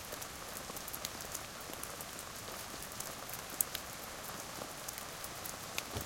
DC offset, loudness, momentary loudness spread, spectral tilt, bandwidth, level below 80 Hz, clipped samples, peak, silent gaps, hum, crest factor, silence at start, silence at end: under 0.1%; -42 LUFS; 8 LU; -1.5 dB/octave; 17 kHz; -62 dBFS; under 0.1%; -8 dBFS; none; none; 36 dB; 0 s; 0 s